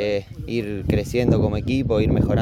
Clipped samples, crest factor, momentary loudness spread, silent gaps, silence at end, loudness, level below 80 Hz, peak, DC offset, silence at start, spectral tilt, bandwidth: under 0.1%; 16 dB; 8 LU; none; 0 s; -22 LUFS; -34 dBFS; -4 dBFS; under 0.1%; 0 s; -8 dB/octave; 16 kHz